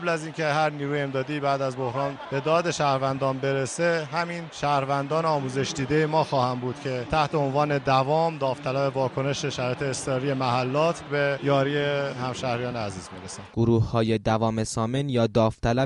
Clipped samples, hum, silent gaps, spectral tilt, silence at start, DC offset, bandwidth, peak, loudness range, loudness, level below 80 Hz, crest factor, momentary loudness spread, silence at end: under 0.1%; none; none; -5.5 dB/octave; 0 s; under 0.1%; 11.5 kHz; -8 dBFS; 1 LU; -25 LUFS; -50 dBFS; 18 dB; 6 LU; 0 s